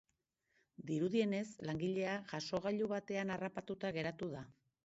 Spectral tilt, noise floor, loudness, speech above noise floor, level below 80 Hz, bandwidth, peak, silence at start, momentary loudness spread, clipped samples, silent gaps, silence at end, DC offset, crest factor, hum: -5 dB/octave; -85 dBFS; -40 LUFS; 45 dB; -74 dBFS; 8 kHz; -24 dBFS; 0.8 s; 9 LU; under 0.1%; none; 0.35 s; under 0.1%; 18 dB; none